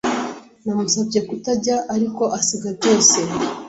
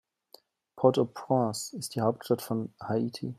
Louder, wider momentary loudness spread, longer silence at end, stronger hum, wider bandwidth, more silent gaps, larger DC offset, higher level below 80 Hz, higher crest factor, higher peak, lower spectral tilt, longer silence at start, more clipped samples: first, -18 LUFS vs -29 LUFS; first, 12 LU vs 9 LU; about the same, 0 s vs 0.05 s; neither; second, 8.2 kHz vs 15.5 kHz; neither; neither; first, -58 dBFS vs -72 dBFS; about the same, 18 dB vs 22 dB; first, -2 dBFS vs -8 dBFS; second, -3 dB/octave vs -6 dB/octave; second, 0.05 s vs 0.75 s; neither